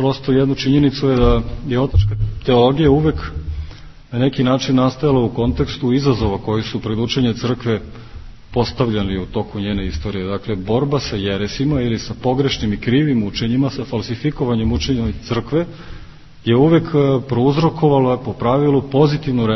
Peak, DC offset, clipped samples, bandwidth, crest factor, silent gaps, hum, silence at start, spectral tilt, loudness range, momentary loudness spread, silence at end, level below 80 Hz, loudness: 0 dBFS; under 0.1%; under 0.1%; 6.2 kHz; 16 dB; none; none; 0 s; -7.5 dB/octave; 5 LU; 9 LU; 0 s; -30 dBFS; -17 LUFS